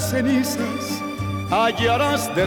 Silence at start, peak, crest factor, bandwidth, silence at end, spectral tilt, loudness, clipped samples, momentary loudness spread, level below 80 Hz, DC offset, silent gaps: 0 s; -6 dBFS; 14 dB; 20 kHz; 0 s; -4.5 dB/octave; -21 LUFS; under 0.1%; 8 LU; -48 dBFS; under 0.1%; none